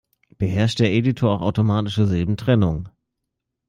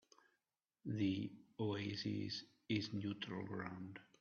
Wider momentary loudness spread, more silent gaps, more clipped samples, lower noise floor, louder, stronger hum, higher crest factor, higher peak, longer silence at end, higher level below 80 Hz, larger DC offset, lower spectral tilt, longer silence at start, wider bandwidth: second, 6 LU vs 9 LU; neither; neither; second, -80 dBFS vs under -90 dBFS; first, -20 LUFS vs -44 LUFS; neither; about the same, 18 dB vs 18 dB; first, -4 dBFS vs -26 dBFS; first, 0.8 s vs 0.15 s; first, -46 dBFS vs -78 dBFS; neither; about the same, -7.5 dB/octave vs -6.5 dB/octave; second, 0.4 s vs 0.85 s; first, 10 kHz vs 7 kHz